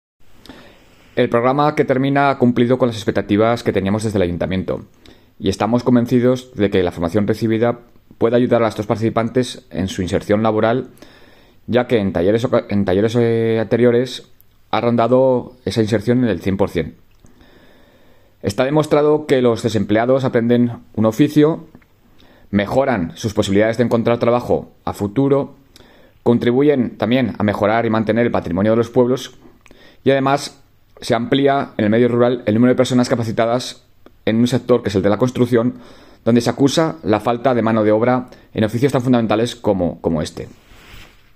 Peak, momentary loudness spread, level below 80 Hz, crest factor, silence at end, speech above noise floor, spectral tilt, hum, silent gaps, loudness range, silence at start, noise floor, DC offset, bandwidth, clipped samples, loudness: -2 dBFS; 8 LU; -48 dBFS; 16 dB; 0.3 s; 32 dB; -6.5 dB/octave; none; none; 3 LU; 0.2 s; -48 dBFS; under 0.1%; 15 kHz; under 0.1%; -17 LUFS